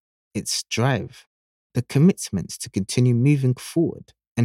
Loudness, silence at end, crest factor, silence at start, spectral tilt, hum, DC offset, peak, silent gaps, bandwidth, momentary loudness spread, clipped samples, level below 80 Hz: -22 LUFS; 0 s; 16 dB; 0.35 s; -6 dB/octave; none; under 0.1%; -6 dBFS; 1.27-1.70 s, 4.27-4.35 s; 15.5 kHz; 12 LU; under 0.1%; -58 dBFS